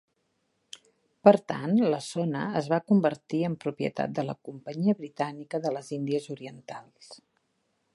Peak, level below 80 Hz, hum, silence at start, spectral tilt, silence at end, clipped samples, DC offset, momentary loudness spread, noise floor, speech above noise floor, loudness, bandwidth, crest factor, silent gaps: -2 dBFS; -74 dBFS; none; 0.75 s; -7 dB/octave; 0.8 s; under 0.1%; under 0.1%; 20 LU; -75 dBFS; 48 dB; -28 LUFS; 11.5 kHz; 26 dB; none